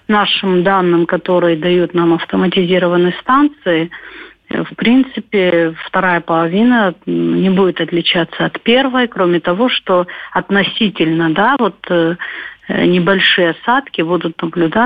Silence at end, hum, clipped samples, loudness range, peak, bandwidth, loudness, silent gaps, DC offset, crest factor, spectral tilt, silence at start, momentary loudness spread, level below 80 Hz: 0 s; none; under 0.1%; 2 LU; -2 dBFS; 5 kHz; -13 LUFS; none; under 0.1%; 12 dB; -8.5 dB/octave; 0.1 s; 6 LU; -52 dBFS